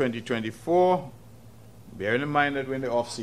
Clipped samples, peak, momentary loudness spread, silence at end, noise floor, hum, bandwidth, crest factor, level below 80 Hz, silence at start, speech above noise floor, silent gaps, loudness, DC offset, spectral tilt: under 0.1%; -8 dBFS; 10 LU; 0 s; -49 dBFS; none; 14.5 kHz; 20 dB; -60 dBFS; 0 s; 24 dB; none; -26 LUFS; 0.2%; -5.5 dB/octave